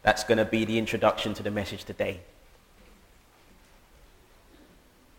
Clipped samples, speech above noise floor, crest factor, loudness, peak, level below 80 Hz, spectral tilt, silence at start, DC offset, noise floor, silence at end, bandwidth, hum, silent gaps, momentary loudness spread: under 0.1%; 31 dB; 24 dB; -27 LUFS; -6 dBFS; -52 dBFS; -5 dB/octave; 0.05 s; under 0.1%; -58 dBFS; 2.95 s; 17 kHz; none; none; 9 LU